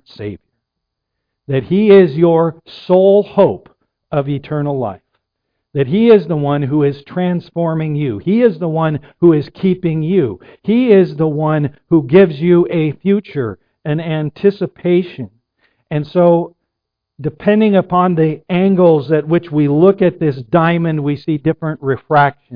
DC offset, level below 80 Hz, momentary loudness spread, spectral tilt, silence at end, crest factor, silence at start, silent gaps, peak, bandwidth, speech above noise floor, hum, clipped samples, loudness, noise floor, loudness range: under 0.1%; -52 dBFS; 11 LU; -11 dB/octave; 0 s; 14 dB; 0.2 s; none; 0 dBFS; 5.2 kHz; 64 dB; none; under 0.1%; -14 LUFS; -77 dBFS; 4 LU